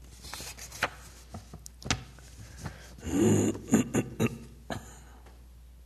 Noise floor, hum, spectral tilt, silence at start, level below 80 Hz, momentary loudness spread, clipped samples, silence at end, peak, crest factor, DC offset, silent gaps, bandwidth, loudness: -51 dBFS; none; -5 dB/octave; 0 s; -50 dBFS; 23 LU; under 0.1%; 0 s; -12 dBFS; 22 dB; under 0.1%; none; 13.5 kHz; -31 LUFS